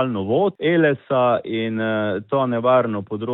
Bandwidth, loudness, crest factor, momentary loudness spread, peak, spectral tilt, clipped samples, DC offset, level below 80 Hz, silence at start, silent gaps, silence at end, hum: 4.1 kHz; -20 LUFS; 14 dB; 6 LU; -6 dBFS; -11 dB/octave; under 0.1%; under 0.1%; -66 dBFS; 0 s; none; 0 s; none